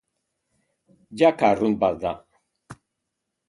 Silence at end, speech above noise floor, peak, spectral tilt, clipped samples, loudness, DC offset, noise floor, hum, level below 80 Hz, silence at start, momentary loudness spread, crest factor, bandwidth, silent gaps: 0.75 s; 60 dB; -4 dBFS; -6.5 dB/octave; under 0.1%; -21 LUFS; under 0.1%; -81 dBFS; none; -58 dBFS; 1.1 s; 18 LU; 20 dB; 11.5 kHz; none